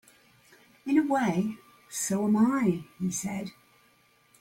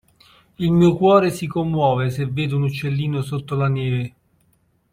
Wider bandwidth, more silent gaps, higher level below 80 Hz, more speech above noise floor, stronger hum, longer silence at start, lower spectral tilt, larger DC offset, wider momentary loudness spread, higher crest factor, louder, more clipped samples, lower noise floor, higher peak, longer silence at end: about the same, 16.5 kHz vs 15.5 kHz; neither; second, -68 dBFS vs -50 dBFS; second, 37 dB vs 44 dB; neither; first, 0.85 s vs 0.6 s; second, -5.5 dB/octave vs -7.5 dB/octave; neither; first, 15 LU vs 10 LU; about the same, 18 dB vs 18 dB; second, -28 LUFS vs -20 LUFS; neither; about the same, -64 dBFS vs -62 dBFS; second, -12 dBFS vs -2 dBFS; about the same, 0.9 s vs 0.85 s